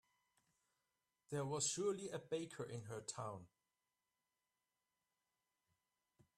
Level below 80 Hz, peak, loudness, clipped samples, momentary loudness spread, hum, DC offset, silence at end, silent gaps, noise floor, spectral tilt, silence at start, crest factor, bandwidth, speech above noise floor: -84 dBFS; -28 dBFS; -45 LUFS; under 0.1%; 10 LU; none; under 0.1%; 2.9 s; none; under -90 dBFS; -4 dB/octave; 1.3 s; 22 dB; 13.5 kHz; over 45 dB